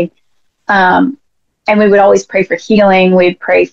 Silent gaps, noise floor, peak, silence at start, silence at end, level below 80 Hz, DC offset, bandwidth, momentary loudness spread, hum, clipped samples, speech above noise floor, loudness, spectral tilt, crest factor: none; -61 dBFS; 0 dBFS; 0 s; 0.05 s; -48 dBFS; 0.5%; 7.6 kHz; 10 LU; none; under 0.1%; 52 dB; -10 LUFS; -6 dB/octave; 10 dB